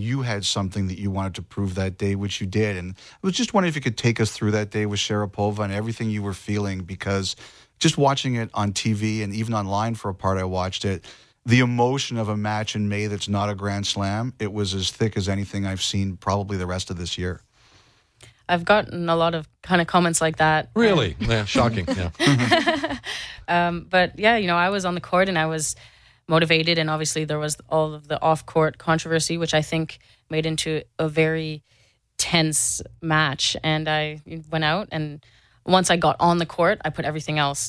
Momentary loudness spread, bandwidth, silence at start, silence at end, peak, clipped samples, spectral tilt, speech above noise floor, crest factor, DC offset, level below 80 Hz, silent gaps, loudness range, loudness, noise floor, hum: 9 LU; 11 kHz; 0 s; 0 s; -4 dBFS; under 0.1%; -4.5 dB/octave; 34 dB; 20 dB; under 0.1%; -48 dBFS; none; 5 LU; -23 LUFS; -57 dBFS; none